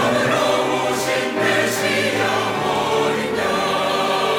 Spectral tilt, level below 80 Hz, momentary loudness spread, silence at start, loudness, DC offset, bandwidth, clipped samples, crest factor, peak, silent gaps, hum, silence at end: -3.5 dB/octave; -54 dBFS; 3 LU; 0 s; -19 LUFS; under 0.1%; 17.5 kHz; under 0.1%; 12 dB; -6 dBFS; none; none; 0 s